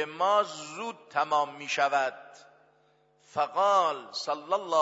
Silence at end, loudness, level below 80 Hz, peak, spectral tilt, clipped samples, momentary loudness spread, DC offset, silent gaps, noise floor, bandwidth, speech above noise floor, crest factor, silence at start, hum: 0 s; -28 LUFS; -84 dBFS; -12 dBFS; -2.5 dB/octave; under 0.1%; 13 LU; under 0.1%; none; -66 dBFS; 8 kHz; 37 dB; 18 dB; 0 s; none